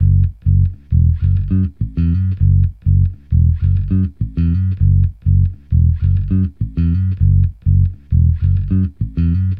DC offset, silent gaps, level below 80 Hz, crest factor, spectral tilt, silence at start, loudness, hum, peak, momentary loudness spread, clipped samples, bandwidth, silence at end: under 0.1%; none; -22 dBFS; 10 dB; -12.5 dB/octave; 0 s; -16 LUFS; none; -2 dBFS; 4 LU; under 0.1%; 2.7 kHz; 0 s